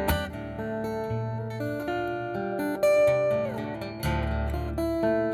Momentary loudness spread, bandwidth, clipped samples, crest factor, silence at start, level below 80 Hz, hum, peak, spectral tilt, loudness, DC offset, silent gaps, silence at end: 10 LU; 17.5 kHz; under 0.1%; 16 dB; 0 s; -40 dBFS; none; -12 dBFS; -6.5 dB/octave; -28 LUFS; under 0.1%; none; 0 s